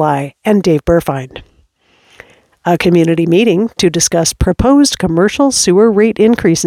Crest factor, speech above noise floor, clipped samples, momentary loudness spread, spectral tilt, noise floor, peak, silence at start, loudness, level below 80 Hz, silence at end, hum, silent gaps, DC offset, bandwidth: 12 dB; 42 dB; under 0.1%; 7 LU; -4.5 dB/octave; -52 dBFS; 0 dBFS; 0 s; -11 LUFS; -30 dBFS; 0 s; none; none; under 0.1%; 16 kHz